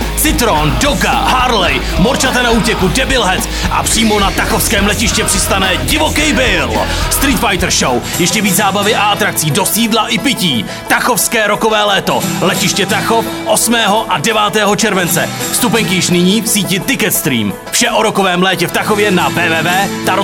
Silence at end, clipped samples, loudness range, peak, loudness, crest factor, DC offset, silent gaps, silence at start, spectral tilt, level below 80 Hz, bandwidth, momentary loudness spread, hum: 0 s; under 0.1%; 1 LU; 0 dBFS; -11 LUFS; 12 dB; under 0.1%; none; 0 s; -3 dB/octave; -26 dBFS; 19 kHz; 3 LU; none